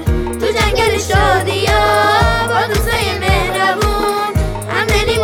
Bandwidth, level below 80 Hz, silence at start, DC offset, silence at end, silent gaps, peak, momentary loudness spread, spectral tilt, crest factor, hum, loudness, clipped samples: 19 kHz; -22 dBFS; 0 s; under 0.1%; 0 s; none; 0 dBFS; 6 LU; -4.5 dB/octave; 14 dB; none; -14 LUFS; under 0.1%